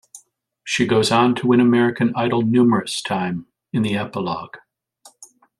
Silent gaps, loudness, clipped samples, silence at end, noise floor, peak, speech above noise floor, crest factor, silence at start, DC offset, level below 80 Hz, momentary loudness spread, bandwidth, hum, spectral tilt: none; -19 LUFS; under 0.1%; 0.35 s; -54 dBFS; -2 dBFS; 36 dB; 18 dB; 0.15 s; under 0.1%; -60 dBFS; 12 LU; 12 kHz; none; -5.5 dB/octave